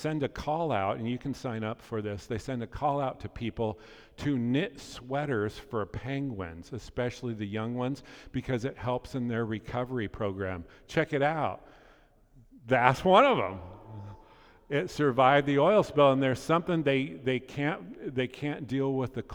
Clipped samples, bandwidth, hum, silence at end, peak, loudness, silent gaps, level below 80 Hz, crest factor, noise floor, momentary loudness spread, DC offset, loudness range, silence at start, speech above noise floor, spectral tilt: under 0.1%; 16.5 kHz; none; 0 s; -4 dBFS; -30 LUFS; none; -54 dBFS; 26 dB; -60 dBFS; 14 LU; under 0.1%; 8 LU; 0 s; 30 dB; -6.5 dB/octave